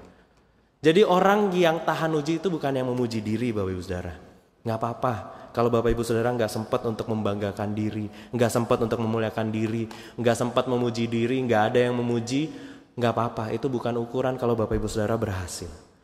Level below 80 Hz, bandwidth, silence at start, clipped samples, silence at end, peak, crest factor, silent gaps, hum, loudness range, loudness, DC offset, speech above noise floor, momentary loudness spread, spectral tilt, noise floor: -48 dBFS; 15.5 kHz; 0 s; under 0.1%; 0.25 s; -6 dBFS; 20 dB; none; none; 4 LU; -25 LUFS; under 0.1%; 36 dB; 11 LU; -6 dB/octave; -61 dBFS